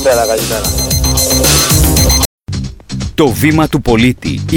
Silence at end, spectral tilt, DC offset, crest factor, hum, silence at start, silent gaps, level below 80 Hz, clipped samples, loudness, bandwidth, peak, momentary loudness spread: 0 s; -4 dB/octave; under 0.1%; 12 dB; none; 0 s; 2.26-2.38 s; -20 dBFS; under 0.1%; -10 LUFS; 19.5 kHz; 0 dBFS; 14 LU